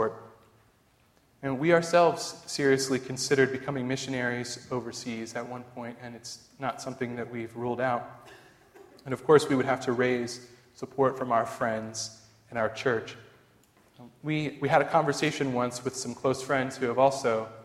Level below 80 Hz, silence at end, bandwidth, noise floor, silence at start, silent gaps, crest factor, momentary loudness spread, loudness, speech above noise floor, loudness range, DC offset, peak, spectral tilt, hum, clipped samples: -66 dBFS; 0 s; 15 kHz; -64 dBFS; 0 s; none; 22 dB; 17 LU; -28 LUFS; 36 dB; 8 LU; under 0.1%; -6 dBFS; -4.5 dB/octave; none; under 0.1%